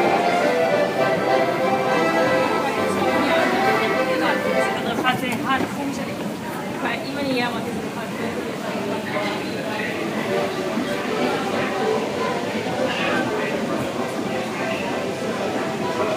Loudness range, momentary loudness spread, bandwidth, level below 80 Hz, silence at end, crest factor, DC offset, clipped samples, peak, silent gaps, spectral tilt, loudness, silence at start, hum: 6 LU; 8 LU; 15.5 kHz; -58 dBFS; 0 s; 18 dB; under 0.1%; under 0.1%; -4 dBFS; none; -4.5 dB/octave; -22 LUFS; 0 s; none